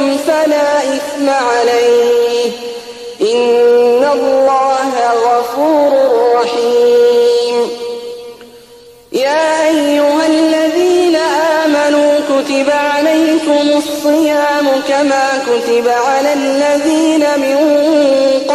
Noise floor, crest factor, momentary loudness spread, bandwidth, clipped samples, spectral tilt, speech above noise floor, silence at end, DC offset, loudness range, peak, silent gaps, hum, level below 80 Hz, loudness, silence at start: -39 dBFS; 10 dB; 5 LU; 13.5 kHz; under 0.1%; -2.5 dB/octave; 28 dB; 0 s; under 0.1%; 2 LU; -2 dBFS; none; none; -56 dBFS; -11 LUFS; 0 s